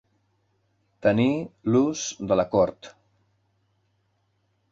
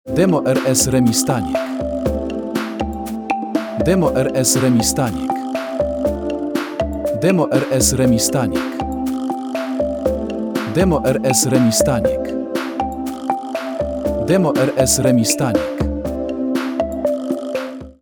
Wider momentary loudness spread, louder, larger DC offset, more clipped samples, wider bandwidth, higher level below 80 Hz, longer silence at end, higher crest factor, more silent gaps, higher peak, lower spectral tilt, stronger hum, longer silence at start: second, 5 LU vs 9 LU; second, -24 LUFS vs -18 LUFS; neither; neither; second, 7.8 kHz vs over 20 kHz; second, -58 dBFS vs -36 dBFS; first, 1.8 s vs 0.1 s; about the same, 20 dB vs 16 dB; neither; second, -8 dBFS vs -2 dBFS; about the same, -5.5 dB/octave vs -4.5 dB/octave; neither; first, 1.05 s vs 0.05 s